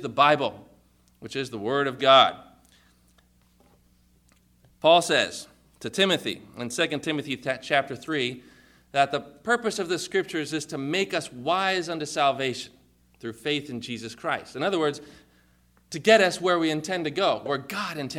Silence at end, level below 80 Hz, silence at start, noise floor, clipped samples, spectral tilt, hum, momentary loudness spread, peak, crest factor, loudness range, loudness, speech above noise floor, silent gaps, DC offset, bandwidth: 0 s; -66 dBFS; 0 s; -62 dBFS; under 0.1%; -3.5 dB/octave; 60 Hz at -65 dBFS; 15 LU; -4 dBFS; 22 dB; 4 LU; -25 LUFS; 36 dB; none; under 0.1%; 15.5 kHz